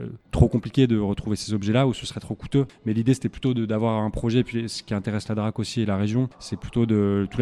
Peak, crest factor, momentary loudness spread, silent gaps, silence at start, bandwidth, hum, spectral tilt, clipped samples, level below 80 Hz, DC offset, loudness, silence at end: -2 dBFS; 22 dB; 8 LU; none; 0 s; 12 kHz; none; -7 dB/octave; under 0.1%; -40 dBFS; under 0.1%; -24 LUFS; 0 s